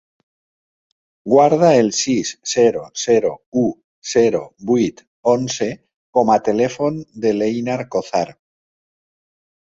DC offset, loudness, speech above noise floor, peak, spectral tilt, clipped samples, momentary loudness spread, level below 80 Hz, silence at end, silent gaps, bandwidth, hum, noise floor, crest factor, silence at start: under 0.1%; -18 LUFS; over 73 dB; -2 dBFS; -4.5 dB/octave; under 0.1%; 10 LU; -58 dBFS; 1.4 s; 3.46-3.52 s, 3.84-4.02 s, 5.07-5.23 s, 5.96-6.13 s; 8 kHz; none; under -90 dBFS; 16 dB; 1.25 s